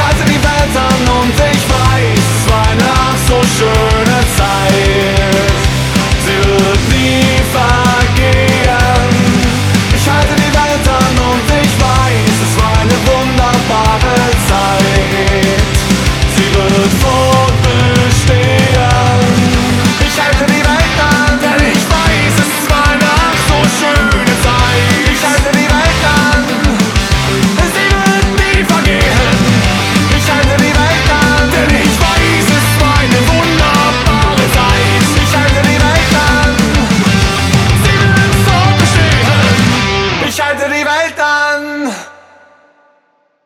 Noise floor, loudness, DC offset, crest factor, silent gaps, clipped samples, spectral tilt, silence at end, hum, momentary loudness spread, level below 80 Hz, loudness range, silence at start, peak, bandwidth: -55 dBFS; -9 LUFS; under 0.1%; 10 dB; none; under 0.1%; -4.5 dB/octave; 1.35 s; none; 2 LU; -18 dBFS; 1 LU; 0 s; 0 dBFS; 17 kHz